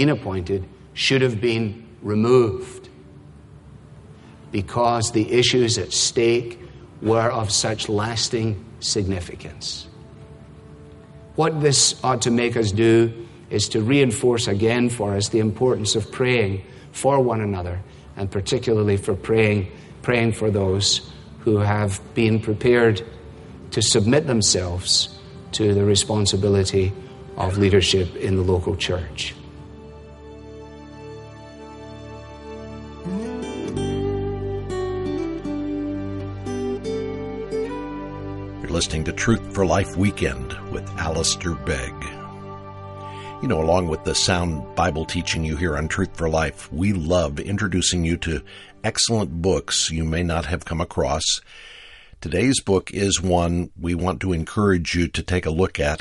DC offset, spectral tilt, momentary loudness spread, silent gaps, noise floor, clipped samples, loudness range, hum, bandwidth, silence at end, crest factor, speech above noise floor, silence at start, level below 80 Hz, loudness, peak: under 0.1%; -4.5 dB/octave; 19 LU; none; -44 dBFS; under 0.1%; 8 LU; none; 11.5 kHz; 0.05 s; 18 dB; 24 dB; 0 s; -40 dBFS; -21 LUFS; -4 dBFS